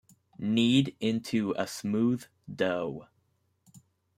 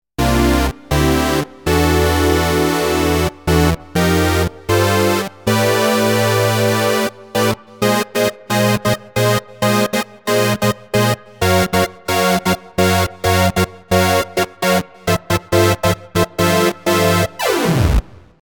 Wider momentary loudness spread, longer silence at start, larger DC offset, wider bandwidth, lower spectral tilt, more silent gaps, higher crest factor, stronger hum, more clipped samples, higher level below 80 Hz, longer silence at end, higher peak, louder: first, 13 LU vs 5 LU; first, 0.4 s vs 0.2 s; neither; second, 15.5 kHz vs over 20 kHz; about the same, -5.5 dB/octave vs -5 dB/octave; neither; about the same, 18 dB vs 16 dB; neither; neither; second, -70 dBFS vs -30 dBFS; about the same, 0.4 s vs 0.4 s; second, -12 dBFS vs 0 dBFS; second, -29 LUFS vs -16 LUFS